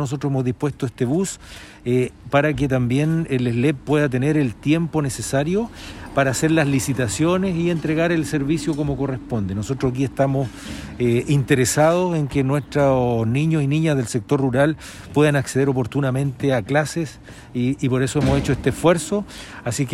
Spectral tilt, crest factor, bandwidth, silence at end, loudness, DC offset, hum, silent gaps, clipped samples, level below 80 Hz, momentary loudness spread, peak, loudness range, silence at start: -6 dB/octave; 16 dB; 14.5 kHz; 0 s; -20 LUFS; under 0.1%; none; none; under 0.1%; -42 dBFS; 8 LU; -4 dBFS; 3 LU; 0 s